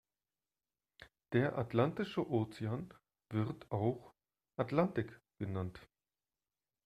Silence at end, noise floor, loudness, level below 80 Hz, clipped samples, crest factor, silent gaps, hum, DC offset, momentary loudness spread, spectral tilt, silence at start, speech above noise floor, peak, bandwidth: 1 s; under -90 dBFS; -38 LUFS; -70 dBFS; under 0.1%; 22 dB; none; none; under 0.1%; 12 LU; -8.5 dB/octave; 1 s; over 54 dB; -18 dBFS; 12.5 kHz